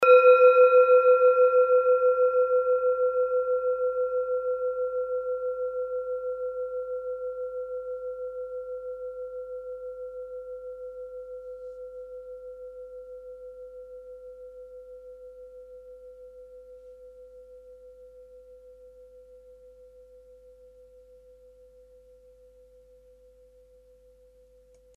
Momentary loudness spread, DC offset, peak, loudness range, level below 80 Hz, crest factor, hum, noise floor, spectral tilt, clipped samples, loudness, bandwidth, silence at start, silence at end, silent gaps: 27 LU; under 0.1%; -6 dBFS; 26 LU; -64 dBFS; 20 dB; none; -57 dBFS; -4 dB/octave; under 0.1%; -24 LUFS; 4.1 kHz; 0 s; 6.4 s; none